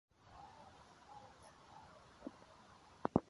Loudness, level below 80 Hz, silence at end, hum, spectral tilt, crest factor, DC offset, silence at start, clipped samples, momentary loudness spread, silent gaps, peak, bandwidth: -52 LUFS; -68 dBFS; 0.05 s; none; -7.5 dB/octave; 32 dB; under 0.1%; 0.2 s; under 0.1%; 12 LU; none; -16 dBFS; 11.5 kHz